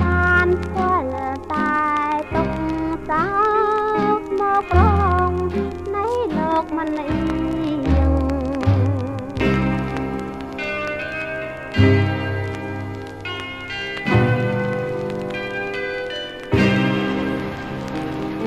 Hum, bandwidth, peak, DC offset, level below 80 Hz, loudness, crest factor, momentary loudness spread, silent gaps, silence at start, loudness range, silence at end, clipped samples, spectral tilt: none; 11 kHz; -2 dBFS; under 0.1%; -32 dBFS; -21 LUFS; 18 dB; 11 LU; none; 0 s; 4 LU; 0 s; under 0.1%; -7.5 dB/octave